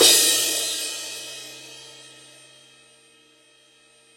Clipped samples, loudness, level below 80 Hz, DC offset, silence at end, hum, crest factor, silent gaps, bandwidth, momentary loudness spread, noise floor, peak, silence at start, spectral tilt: under 0.1%; -19 LUFS; -74 dBFS; under 0.1%; 2.25 s; none; 24 dB; none; 16.5 kHz; 27 LU; -56 dBFS; -2 dBFS; 0 s; 1 dB/octave